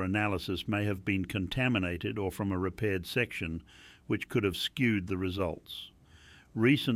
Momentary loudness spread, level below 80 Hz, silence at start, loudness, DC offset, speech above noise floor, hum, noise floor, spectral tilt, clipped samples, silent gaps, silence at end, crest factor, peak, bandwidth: 12 LU; -56 dBFS; 0 s; -32 LUFS; under 0.1%; 25 dB; none; -57 dBFS; -6 dB/octave; under 0.1%; none; 0 s; 18 dB; -14 dBFS; 16 kHz